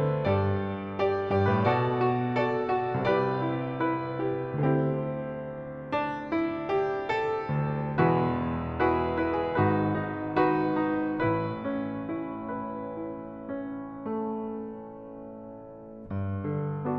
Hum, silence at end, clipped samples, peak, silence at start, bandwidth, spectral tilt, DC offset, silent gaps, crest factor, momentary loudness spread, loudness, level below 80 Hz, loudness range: none; 0 s; under 0.1%; -10 dBFS; 0 s; 6.4 kHz; -9.5 dB/octave; under 0.1%; none; 18 dB; 12 LU; -29 LUFS; -54 dBFS; 9 LU